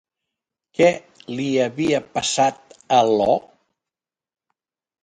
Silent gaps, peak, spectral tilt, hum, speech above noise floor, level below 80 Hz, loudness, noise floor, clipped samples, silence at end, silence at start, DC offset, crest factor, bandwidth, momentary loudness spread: none; -2 dBFS; -4 dB/octave; none; 70 dB; -60 dBFS; -20 LUFS; -89 dBFS; under 0.1%; 1.65 s; 0.8 s; under 0.1%; 20 dB; 10.5 kHz; 11 LU